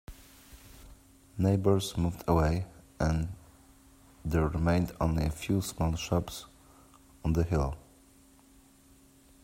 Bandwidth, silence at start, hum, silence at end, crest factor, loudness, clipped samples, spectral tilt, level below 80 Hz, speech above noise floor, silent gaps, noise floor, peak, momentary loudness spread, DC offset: 16 kHz; 0.1 s; none; 1.65 s; 20 dB; -30 LUFS; under 0.1%; -6.5 dB/octave; -44 dBFS; 31 dB; none; -59 dBFS; -12 dBFS; 19 LU; under 0.1%